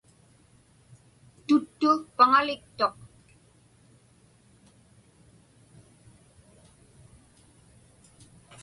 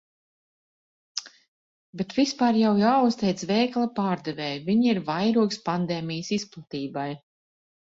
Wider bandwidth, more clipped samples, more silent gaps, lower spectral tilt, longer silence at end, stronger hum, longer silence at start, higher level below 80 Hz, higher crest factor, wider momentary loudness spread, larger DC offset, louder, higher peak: first, 11.5 kHz vs 7.8 kHz; neither; second, none vs 1.48-1.93 s; about the same, -4.5 dB/octave vs -5.5 dB/octave; first, 5.75 s vs 0.75 s; neither; first, 1.5 s vs 1.15 s; about the same, -66 dBFS vs -66 dBFS; first, 24 dB vs 18 dB; second, 10 LU vs 14 LU; neither; about the same, -24 LUFS vs -25 LUFS; about the same, -6 dBFS vs -8 dBFS